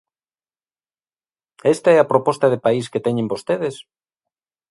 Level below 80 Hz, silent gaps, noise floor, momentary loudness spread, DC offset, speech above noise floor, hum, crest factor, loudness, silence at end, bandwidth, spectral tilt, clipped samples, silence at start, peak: -66 dBFS; none; under -90 dBFS; 9 LU; under 0.1%; over 72 dB; none; 20 dB; -18 LUFS; 0.9 s; 11.5 kHz; -6 dB/octave; under 0.1%; 1.65 s; 0 dBFS